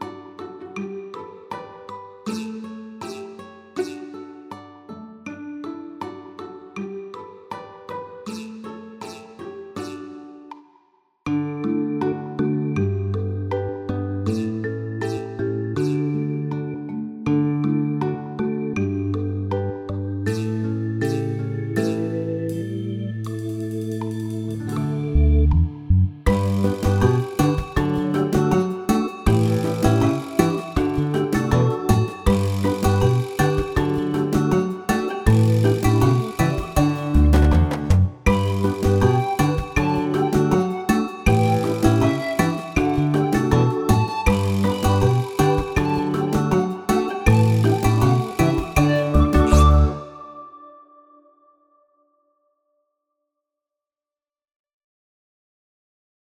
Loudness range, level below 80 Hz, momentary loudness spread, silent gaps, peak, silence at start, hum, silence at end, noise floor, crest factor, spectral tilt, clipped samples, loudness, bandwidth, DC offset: 15 LU; -30 dBFS; 18 LU; none; 0 dBFS; 0 s; none; 5.55 s; under -90 dBFS; 20 dB; -7 dB/octave; under 0.1%; -21 LUFS; 17 kHz; under 0.1%